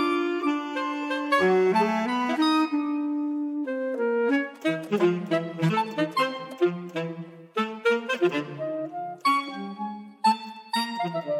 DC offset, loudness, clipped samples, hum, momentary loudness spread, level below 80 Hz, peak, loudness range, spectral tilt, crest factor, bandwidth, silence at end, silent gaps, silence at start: under 0.1%; -26 LUFS; under 0.1%; none; 10 LU; -80 dBFS; -10 dBFS; 4 LU; -6 dB/octave; 16 dB; 14.5 kHz; 0 s; none; 0 s